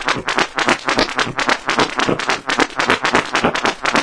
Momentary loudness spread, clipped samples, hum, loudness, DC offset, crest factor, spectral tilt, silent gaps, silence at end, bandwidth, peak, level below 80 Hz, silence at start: 2 LU; under 0.1%; none; -17 LUFS; 0.4%; 18 dB; -3 dB/octave; none; 0 s; 11 kHz; 0 dBFS; -44 dBFS; 0 s